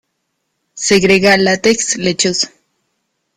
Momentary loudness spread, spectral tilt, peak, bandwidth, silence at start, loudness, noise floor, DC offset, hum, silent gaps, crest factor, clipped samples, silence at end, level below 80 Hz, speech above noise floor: 9 LU; -3 dB/octave; 0 dBFS; 15 kHz; 0.75 s; -12 LUFS; -70 dBFS; under 0.1%; none; none; 16 dB; under 0.1%; 0.9 s; -48 dBFS; 57 dB